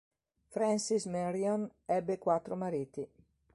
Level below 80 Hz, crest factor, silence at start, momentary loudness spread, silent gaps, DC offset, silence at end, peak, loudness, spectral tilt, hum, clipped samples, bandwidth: -72 dBFS; 18 dB; 0.5 s; 11 LU; none; under 0.1%; 0.5 s; -16 dBFS; -34 LUFS; -5.5 dB/octave; none; under 0.1%; 11.5 kHz